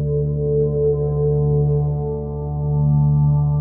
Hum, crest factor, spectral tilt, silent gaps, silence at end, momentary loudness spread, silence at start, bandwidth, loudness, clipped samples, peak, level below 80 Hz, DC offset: none; 10 dB; -17.5 dB/octave; none; 0 s; 8 LU; 0 s; 1.2 kHz; -19 LUFS; under 0.1%; -8 dBFS; -30 dBFS; under 0.1%